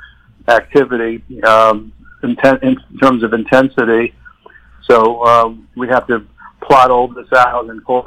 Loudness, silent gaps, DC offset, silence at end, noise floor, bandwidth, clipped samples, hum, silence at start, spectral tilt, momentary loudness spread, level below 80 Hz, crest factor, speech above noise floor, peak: -12 LUFS; none; under 0.1%; 0.05 s; -42 dBFS; 16.5 kHz; under 0.1%; none; 0 s; -6 dB/octave; 12 LU; -44 dBFS; 12 dB; 31 dB; 0 dBFS